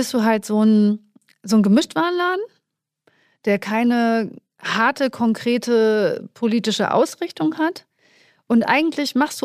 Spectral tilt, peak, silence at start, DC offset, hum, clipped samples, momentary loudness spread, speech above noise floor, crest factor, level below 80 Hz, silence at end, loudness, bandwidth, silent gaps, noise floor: -5 dB/octave; -2 dBFS; 0 s; under 0.1%; none; under 0.1%; 8 LU; 58 dB; 18 dB; -70 dBFS; 0.05 s; -19 LUFS; 15 kHz; none; -77 dBFS